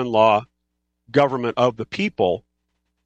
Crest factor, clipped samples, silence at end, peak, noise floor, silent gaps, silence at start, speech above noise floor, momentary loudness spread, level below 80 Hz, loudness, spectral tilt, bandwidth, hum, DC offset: 18 dB; under 0.1%; 0.65 s; -2 dBFS; -76 dBFS; none; 0 s; 56 dB; 8 LU; -62 dBFS; -20 LUFS; -6.5 dB/octave; 8.4 kHz; none; under 0.1%